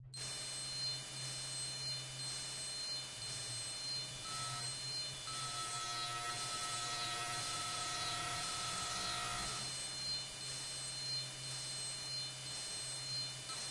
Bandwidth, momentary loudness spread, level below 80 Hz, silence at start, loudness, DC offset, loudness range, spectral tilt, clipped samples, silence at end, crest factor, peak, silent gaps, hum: 11.5 kHz; 3 LU; -68 dBFS; 0 s; -40 LUFS; under 0.1%; 2 LU; -1 dB/octave; under 0.1%; 0 s; 14 dB; -28 dBFS; none; none